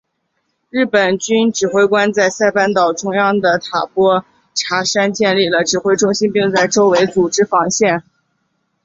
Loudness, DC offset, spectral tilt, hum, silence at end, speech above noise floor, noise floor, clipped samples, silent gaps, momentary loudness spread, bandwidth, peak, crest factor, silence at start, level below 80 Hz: -14 LUFS; under 0.1%; -3.5 dB/octave; none; 0.85 s; 54 dB; -68 dBFS; under 0.1%; none; 5 LU; 7.8 kHz; -2 dBFS; 14 dB; 0.75 s; -58 dBFS